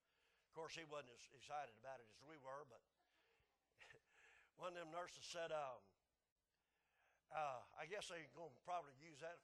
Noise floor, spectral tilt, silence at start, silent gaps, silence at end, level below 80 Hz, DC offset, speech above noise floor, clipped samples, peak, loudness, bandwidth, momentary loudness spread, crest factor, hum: under -90 dBFS; -3 dB/octave; 0.55 s; 6.32-6.36 s; 0.05 s; under -90 dBFS; under 0.1%; over 36 dB; under 0.1%; -34 dBFS; -54 LUFS; 12 kHz; 15 LU; 22 dB; none